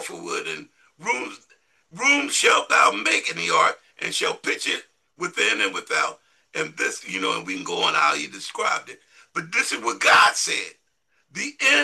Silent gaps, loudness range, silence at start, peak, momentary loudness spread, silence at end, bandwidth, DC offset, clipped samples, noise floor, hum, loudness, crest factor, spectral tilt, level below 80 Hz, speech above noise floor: none; 5 LU; 0 s; -4 dBFS; 14 LU; 0 s; 12.5 kHz; under 0.1%; under 0.1%; -70 dBFS; none; -21 LUFS; 20 dB; -0.5 dB/octave; -76 dBFS; 47 dB